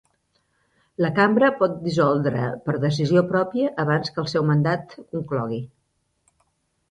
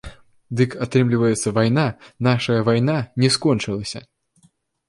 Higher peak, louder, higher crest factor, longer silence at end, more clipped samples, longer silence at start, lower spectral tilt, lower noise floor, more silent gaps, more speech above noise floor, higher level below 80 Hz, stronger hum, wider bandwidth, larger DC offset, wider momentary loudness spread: about the same, -6 dBFS vs -4 dBFS; about the same, -22 LUFS vs -20 LUFS; about the same, 18 dB vs 16 dB; first, 1.25 s vs 0.9 s; neither; first, 1 s vs 0.05 s; first, -7.5 dB/octave vs -5.5 dB/octave; first, -71 dBFS vs -60 dBFS; neither; first, 50 dB vs 41 dB; second, -60 dBFS vs -50 dBFS; neither; second, 9.6 kHz vs 11.5 kHz; neither; about the same, 11 LU vs 9 LU